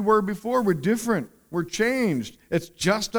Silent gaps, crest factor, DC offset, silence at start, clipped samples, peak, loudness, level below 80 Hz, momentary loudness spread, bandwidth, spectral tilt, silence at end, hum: none; 16 dB; under 0.1%; 0 s; under 0.1%; -8 dBFS; -25 LUFS; -56 dBFS; 7 LU; over 20 kHz; -5 dB/octave; 0 s; none